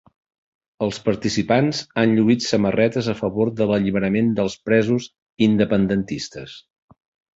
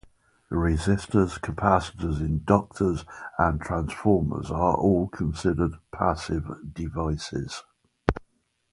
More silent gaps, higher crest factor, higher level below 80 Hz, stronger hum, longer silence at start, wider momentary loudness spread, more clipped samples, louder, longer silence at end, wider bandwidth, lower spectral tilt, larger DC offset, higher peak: first, 5.22-5.26 s vs none; second, 18 dB vs 26 dB; second, -52 dBFS vs -38 dBFS; neither; first, 0.8 s vs 0.5 s; about the same, 9 LU vs 11 LU; neither; first, -20 LUFS vs -26 LUFS; first, 0.8 s vs 0.55 s; second, 8 kHz vs 11.5 kHz; about the same, -6 dB/octave vs -7 dB/octave; neither; about the same, -2 dBFS vs 0 dBFS